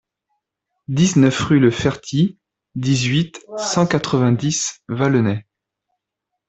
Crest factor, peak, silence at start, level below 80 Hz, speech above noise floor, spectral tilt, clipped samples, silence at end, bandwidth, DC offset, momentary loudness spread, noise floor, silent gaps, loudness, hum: 16 dB; -2 dBFS; 0.9 s; -50 dBFS; 63 dB; -5.5 dB/octave; under 0.1%; 1.1 s; 8.4 kHz; under 0.1%; 10 LU; -80 dBFS; none; -18 LUFS; none